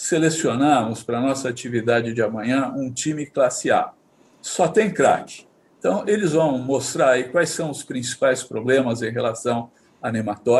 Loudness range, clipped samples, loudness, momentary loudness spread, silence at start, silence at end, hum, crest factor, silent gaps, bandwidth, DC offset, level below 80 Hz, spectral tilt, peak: 2 LU; under 0.1%; -21 LUFS; 9 LU; 0 s; 0 s; none; 16 dB; none; 12.5 kHz; under 0.1%; -66 dBFS; -4.5 dB/octave; -4 dBFS